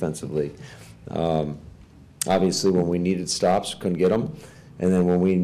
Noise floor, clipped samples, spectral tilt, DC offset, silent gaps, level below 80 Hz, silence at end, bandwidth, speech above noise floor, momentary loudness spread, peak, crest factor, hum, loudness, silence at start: -48 dBFS; under 0.1%; -5.5 dB/octave; under 0.1%; none; -50 dBFS; 0 s; 14.5 kHz; 25 dB; 16 LU; -10 dBFS; 14 dB; none; -23 LUFS; 0 s